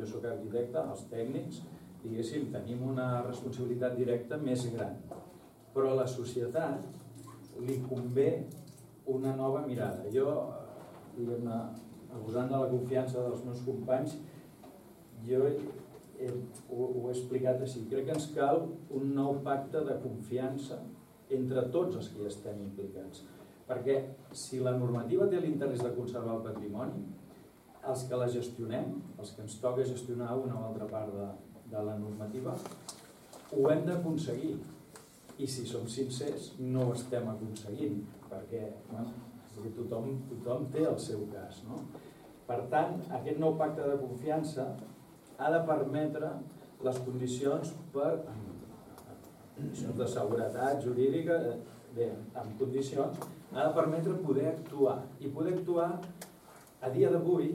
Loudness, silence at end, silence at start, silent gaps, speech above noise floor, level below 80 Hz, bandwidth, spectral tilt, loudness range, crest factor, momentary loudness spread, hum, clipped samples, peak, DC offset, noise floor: -35 LUFS; 0 s; 0 s; none; 23 dB; -72 dBFS; 16.5 kHz; -7 dB/octave; 4 LU; 20 dB; 18 LU; none; under 0.1%; -16 dBFS; under 0.1%; -57 dBFS